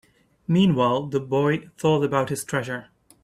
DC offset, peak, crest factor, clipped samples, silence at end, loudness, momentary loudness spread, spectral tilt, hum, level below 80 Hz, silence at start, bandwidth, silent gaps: under 0.1%; -6 dBFS; 18 dB; under 0.1%; 0.4 s; -23 LUFS; 10 LU; -6 dB/octave; none; -60 dBFS; 0.5 s; 14 kHz; none